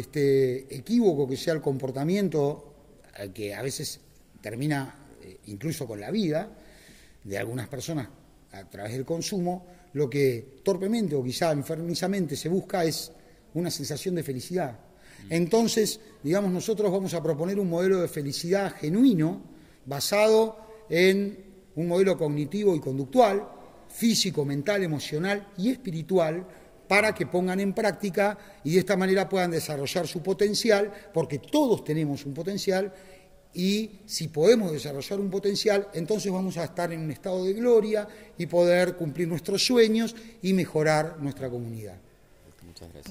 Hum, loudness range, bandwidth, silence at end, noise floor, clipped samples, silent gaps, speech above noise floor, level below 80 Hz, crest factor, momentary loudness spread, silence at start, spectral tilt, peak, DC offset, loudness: none; 8 LU; 16 kHz; 0 s; -55 dBFS; under 0.1%; none; 29 dB; -60 dBFS; 20 dB; 13 LU; 0 s; -5 dB/octave; -6 dBFS; under 0.1%; -26 LUFS